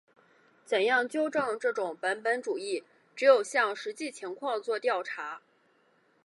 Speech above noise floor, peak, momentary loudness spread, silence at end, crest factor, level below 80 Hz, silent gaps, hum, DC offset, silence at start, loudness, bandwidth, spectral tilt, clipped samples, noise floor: 39 dB; -10 dBFS; 14 LU; 0.85 s; 20 dB; -84 dBFS; none; none; under 0.1%; 0.7 s; -29 LUFS; 11.5 kHz; -2.5 dB/octave; under 0.1%; -68 dBFS